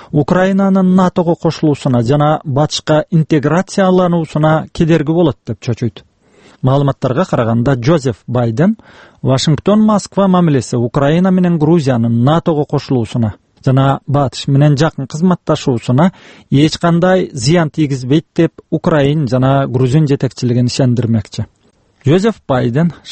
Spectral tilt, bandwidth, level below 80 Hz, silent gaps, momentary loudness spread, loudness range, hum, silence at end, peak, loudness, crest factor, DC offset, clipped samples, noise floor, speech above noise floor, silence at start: -7 dB/octave; 8.8 kHz; -42 dBFS; none; 5 LU; 2 LU; none; 0 s; 0 dBFS; -13 LUFS; 12 dB; under 0.1%; under 0.1%; -52 dBFS; 40 dB; 0 s